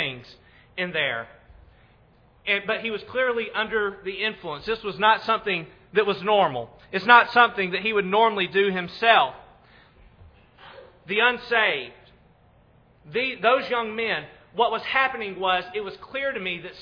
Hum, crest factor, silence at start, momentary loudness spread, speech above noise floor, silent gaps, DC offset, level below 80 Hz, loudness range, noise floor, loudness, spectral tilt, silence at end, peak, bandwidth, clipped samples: none; 24 dB; 0 s; 12 LU; 34 dB; none; under 0.1%; -60 dBFS; 7 LU; -57 dBFS; -23 LUFS; -6 dB/octave; 0 s; 0 dBFS; 5.4 kHz; under 0.1%